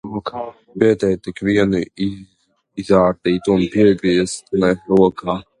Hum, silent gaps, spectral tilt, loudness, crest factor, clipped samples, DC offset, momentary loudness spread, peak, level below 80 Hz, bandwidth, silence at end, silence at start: none; none; -6.5 dB/octave; -17 LUFS; 16 dB; under 0.1%; under 0.1%; 13 LU; 0 dBFS; -46 dBFS; 11 kHz; 0.2 s; 0.05 s